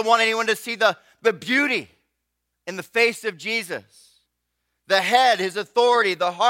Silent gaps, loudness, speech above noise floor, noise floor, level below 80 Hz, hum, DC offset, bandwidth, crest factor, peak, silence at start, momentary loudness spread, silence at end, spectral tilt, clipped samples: none; -20 LUFS; 57 dB; -78 dBFS; -74 dBFS; 60 Hz at -65 dBFS; under 0.1%; 16.5 kHz; 20 dB; -2 dBFS; 0 s; 12 LU; 0 s; -2.5 dB/octave; under 0.1%